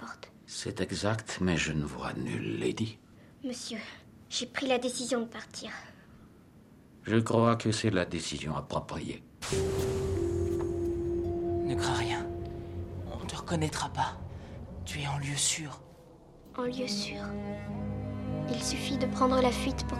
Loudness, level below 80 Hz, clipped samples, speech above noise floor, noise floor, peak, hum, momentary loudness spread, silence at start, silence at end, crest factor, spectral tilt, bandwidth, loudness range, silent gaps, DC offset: -32 LUFS; -50 dBFS; under 0.1%; 25 dB; -56 dBFS; -12 dBFS; none; 13 LU; 0 s; 0 s; 22 dB; -4.5 dB/octave; 15 kHz; 4 LU; none; under 0.1%